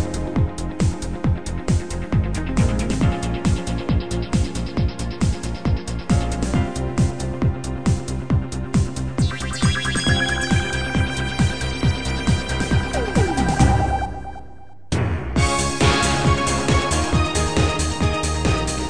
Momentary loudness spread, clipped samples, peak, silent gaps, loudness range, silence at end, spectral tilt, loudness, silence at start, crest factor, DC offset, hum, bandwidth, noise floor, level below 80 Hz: 6 LU; under 0.1%; -2 dBFS; none; 4 LU; 0 s; -5 dB/octave; -21 LUFS; 0 s; 18 dB; 2%; none; 10 kHz; -44 dBFS; -28 dBFS